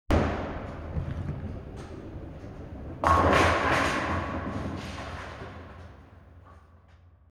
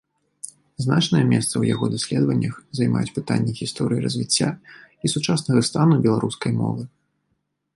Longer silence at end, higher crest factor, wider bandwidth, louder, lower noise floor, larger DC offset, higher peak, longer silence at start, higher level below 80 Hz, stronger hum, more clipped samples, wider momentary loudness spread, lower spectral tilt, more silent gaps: second, 0.55 s vs 0.9 s; first, 24 dB vs 18 dB; first, 13.5 kHz vs 11.5 kHz; second, -28 LUFS vs -21 LUFS; second, -56 dBFS vs -73 dBFS; neither; about the same, -6 dBFS vs -4 dBFS; second, 0.1 s vs 0.45 s; first, -40 dBFS vs -56 dBFS; neither; neither; first, 21 LU vs 11 LU; about the same, -5.5 dB/octave vs -5.5 dB/octave; neither